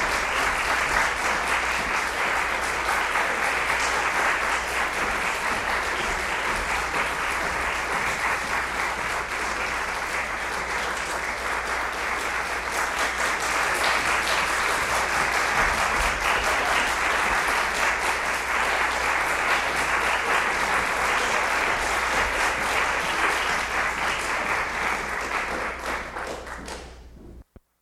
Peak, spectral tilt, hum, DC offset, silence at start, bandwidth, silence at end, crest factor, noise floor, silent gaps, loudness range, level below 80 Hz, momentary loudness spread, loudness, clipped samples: -8 dBFS; -1.5 dB/octave; none; under 0.1%; 0 s; 16 kHz; 0.4 s; 18 dB; -48 dBFS; none; 4 LU; -42 dBFS; 5 LU; -23 LUFS; under 0.1%